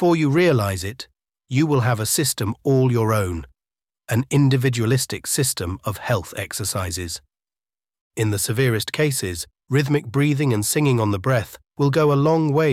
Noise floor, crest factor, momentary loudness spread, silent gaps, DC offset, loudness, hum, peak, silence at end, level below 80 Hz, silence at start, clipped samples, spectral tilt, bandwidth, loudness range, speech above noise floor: under -90 dBFS; 14 dB; 11 LU; 8.01-8.10 s; under 0.1%; -21 LUFS; none; -6 dBFS; 0 s; -50 dBFS; 0 s; under 0.1%; -5 dB/octave; 16 kHz; 4 LU; over 70 dB